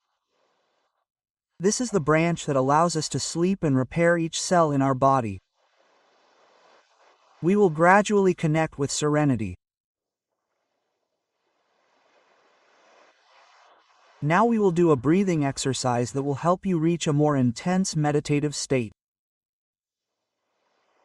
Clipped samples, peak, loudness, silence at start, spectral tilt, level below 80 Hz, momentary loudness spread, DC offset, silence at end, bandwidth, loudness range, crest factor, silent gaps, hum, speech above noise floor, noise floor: under 0.1%; -4 dBFS; -23 LUFS; 1.6 s; -5.5 dB/octave; -58 dBFS; 7 LU; under 0.1%; 2.15 s; 12 kHz; 6 LU; 22 dB; 9.80-9.95 s; none; 64 dB; -86 dBFS